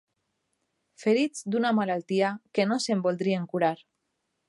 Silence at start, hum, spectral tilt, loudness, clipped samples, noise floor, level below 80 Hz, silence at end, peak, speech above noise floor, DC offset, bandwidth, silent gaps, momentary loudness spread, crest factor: 1 s; none; -5.5 dB/octave; -27 LUFS; under 0.1%; -79 dBFS; -78 dBFS; 0.75 s; -10 dBFS; 53 dB; under 0.1%; 11.5 kHz; none; 3 LU; 18 dB